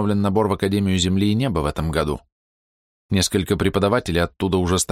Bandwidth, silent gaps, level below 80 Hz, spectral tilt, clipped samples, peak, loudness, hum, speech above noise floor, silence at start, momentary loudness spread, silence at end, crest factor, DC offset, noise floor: 16 kHz; 2.32-3.09 s; -38 dBFS; -5 dB/octave; under 0.1%; -6 dBFS; -20 LUFS; none; over 70 dB; 0 s; 4 LU; 0 s; 16 dB; under 0.1%; under -90 dBFS